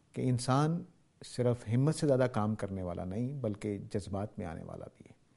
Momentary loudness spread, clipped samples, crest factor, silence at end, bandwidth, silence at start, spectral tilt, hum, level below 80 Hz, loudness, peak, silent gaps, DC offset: 16 LU; under 0.1%; 20 dB; 0.45 s; 11.5 kHz; 0.15 s; -7 dB/octave; none; -62 dBFS; -34 LUFS; -14 dBFS; none; under 0.1%